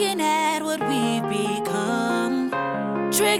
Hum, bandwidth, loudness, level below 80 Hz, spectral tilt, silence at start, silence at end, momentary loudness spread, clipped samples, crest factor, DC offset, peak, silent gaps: none; 16.5 kHz; -23 LUFS; -68 dBFS; -3.5 dB/octave; 0 s; 0 s; 4 LU; under 0.1%; 14 dB; under 0.1%; -8 dBFS; none